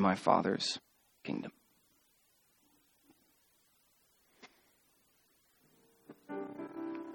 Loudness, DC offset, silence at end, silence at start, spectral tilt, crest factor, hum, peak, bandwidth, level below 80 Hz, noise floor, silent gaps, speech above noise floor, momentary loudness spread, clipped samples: -36 LUFS; under 0.1%; 0 s; 0 s; -5 dB/octave; 28 dB; none; -12 dBFS; 19 kHz; -80 dBFS; -72 dBFS; none; 39 dB; 30 LU; under 0.1%